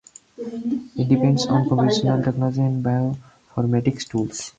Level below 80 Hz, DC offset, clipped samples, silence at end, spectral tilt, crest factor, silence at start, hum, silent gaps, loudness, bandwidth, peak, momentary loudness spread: -54 dBFS; under 0.1%; under 0.1%; 0.1 s; -6.5 dB/octave; 18 dB; 0.4 s; none; none; -21 LUFS; 9 kHz; -4 dBFS; 11 LU